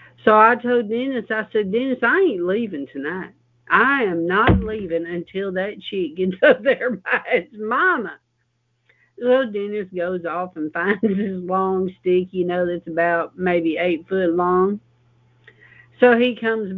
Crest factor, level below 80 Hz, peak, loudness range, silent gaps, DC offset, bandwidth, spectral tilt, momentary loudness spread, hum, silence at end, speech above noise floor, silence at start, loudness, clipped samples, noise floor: 20 dB; -42 dBFS; 0 dBFS; 3 LU; none; under 0.1%; 4.7 kHz; -9 dB/octave; 11 LU; none; 0 s; 49 dB; 0.25 s; -20 LUFS; under 0.1%; -69 dBFS